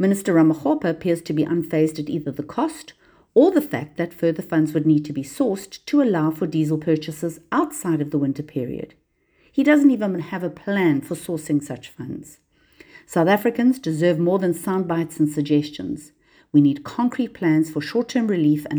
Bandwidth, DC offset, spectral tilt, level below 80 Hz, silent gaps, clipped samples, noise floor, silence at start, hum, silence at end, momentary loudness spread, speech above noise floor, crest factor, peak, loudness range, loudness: over 20 kHz; under 0.1%; -7 dB/octave; -60 dBFS; none; under 0.1%; -61 dBFS; 0 s; none; 0 s; 11 LU; 41 dB; 18 dB; -4 dBFS; 3 LU; -21 LUFS